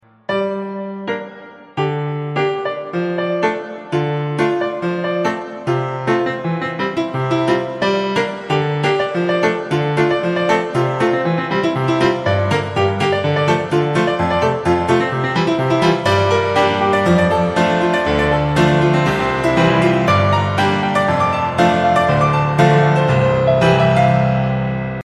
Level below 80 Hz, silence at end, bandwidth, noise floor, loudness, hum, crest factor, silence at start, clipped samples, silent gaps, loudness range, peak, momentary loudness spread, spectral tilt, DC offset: -42 dBFS; 0 s; 12 kHz; -37 dBFS; -16 LUFS; none; 16 dB; 0.3 s; under 0.1%; none; 6 LU; 0 dBFS; 8 LU; -6.5 dB/octave; under 0.1%